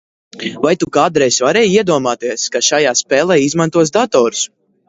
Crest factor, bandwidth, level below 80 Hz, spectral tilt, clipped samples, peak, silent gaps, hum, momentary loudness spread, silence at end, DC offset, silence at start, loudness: 14 dB; 8 kHz; -54 dBFS; -3.5 dB/octave; under 0.1%; 0 dBFS; none; none; 7 LU; 0.4 s; under 0.1%; 0.35 s; -13 LUFS